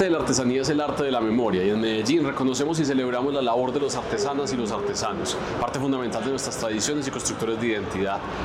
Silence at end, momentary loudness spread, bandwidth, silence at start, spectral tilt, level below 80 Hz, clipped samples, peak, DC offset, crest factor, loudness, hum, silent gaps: 0 s; 5 LU; 15.5 kHz; 0 s; -4.5 dB/octave; -50 dBFS; under 0.1%; -8 dBFS; under 0.1%; 16 dB; -24 LUFS; none; none